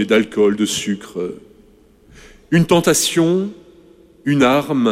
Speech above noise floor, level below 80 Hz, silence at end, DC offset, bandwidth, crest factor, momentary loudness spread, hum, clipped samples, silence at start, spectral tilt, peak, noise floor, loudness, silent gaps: 33 dB; -50 dBFS; 0 s; under 0.1%; 16 kHz; 16 dB; 13 LU; none; under 0.1%; 0 s; -4.5 dB/octave; -2 dBFS; -49 dBFS; -17 LUFS; none